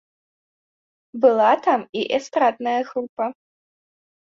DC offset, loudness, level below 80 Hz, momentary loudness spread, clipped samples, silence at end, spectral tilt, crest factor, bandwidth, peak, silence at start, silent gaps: under 0.1%; -21 LUFS; -72 dBFS; 12 LU; under 0.1%; 0.9 s; -4.5 dB/octave; 18 dB; 7.6 kHz; -4 dBFS; 1.15 s; 1.89-1.93 s, 3.09-3.17 s